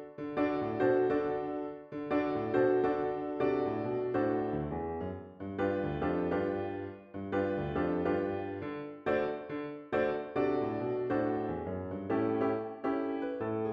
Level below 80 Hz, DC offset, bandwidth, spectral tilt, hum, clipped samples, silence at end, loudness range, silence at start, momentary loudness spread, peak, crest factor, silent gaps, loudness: -58 dBFS; under 0.1%; 5.8 kHz; -9.5 dB/octave; none; under 0.1%; 0 s; 3 LU; 0 s; 10 LU; -18 dBFS; 16 dB; none; -33 LUFS